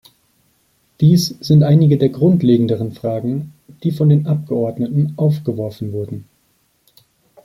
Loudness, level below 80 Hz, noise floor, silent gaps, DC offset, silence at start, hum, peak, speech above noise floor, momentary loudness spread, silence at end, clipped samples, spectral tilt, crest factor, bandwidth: -16 LUFS; -52 dBFS; -61 dBFS; none; under 0.1%; 1 s; none; -2 dBFS; 46 dB; 13 LU; 1.2 s; under 0.1%; -8 dB/octave; 16 dB; 13.5 kHz